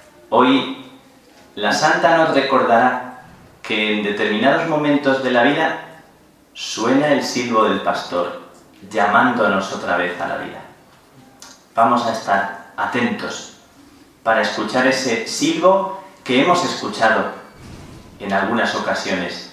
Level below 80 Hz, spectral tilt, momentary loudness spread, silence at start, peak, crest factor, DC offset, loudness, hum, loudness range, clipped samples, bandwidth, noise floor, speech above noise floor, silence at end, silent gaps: -58 dBFS; -4 dB/octave; 14 LU; 0.3 s; 0 dBFS; 18 dB; under 0.1%; -18 LUFS; none; 4 LU; under 0.1%; 14 kHz; -50 dBFS; 33 dB; 0 s; none